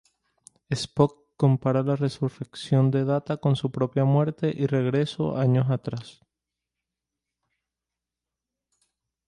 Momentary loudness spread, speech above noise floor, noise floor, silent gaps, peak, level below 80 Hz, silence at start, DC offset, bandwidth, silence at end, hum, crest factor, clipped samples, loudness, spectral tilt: 9 LU; 64 dB; -88 dBFS; none; -6 dBFS; -62 dBFS; 0.7 s; under 0.1%; 11 kHz; 3.15 s; none; 20 dB; under 0.1%; -25 LUFS; -8 dB/octave